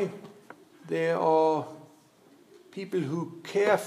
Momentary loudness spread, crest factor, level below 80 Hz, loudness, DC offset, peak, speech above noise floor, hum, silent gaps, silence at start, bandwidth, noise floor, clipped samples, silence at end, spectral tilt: 24 LU; 20 dB; -86 dBFS; -28 LUFS; under 0.1%; -10 dBFS; 32 dB; none; none; 0 s; 14.5 kHz; -58 dBFS; under 0.1%; 0 s; -6 dB/octave